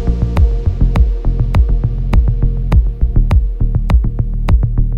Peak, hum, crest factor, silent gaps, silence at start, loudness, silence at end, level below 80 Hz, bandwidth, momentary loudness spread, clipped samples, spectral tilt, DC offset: -2 dBFS; none; 10 dB; none; 0 s; -15 LUFS; 0 s; -12 dBFS; 5.2 kHz; 4 LU; under 0.1%; -9 dB/octave; under 0.1%